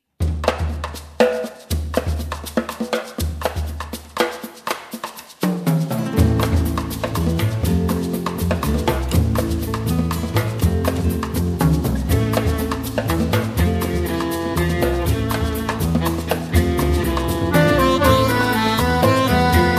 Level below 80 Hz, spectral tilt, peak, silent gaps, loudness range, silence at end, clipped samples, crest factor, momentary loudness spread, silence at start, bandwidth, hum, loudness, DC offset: -28 dBFS; -6 dB/octave; 0 dBFS; none; 7 LU; 0 s; under 0.1%; 18 dB; 10 LU; 0.2 s; 15.5 kHz; none; -20 LUFS; under 0.1%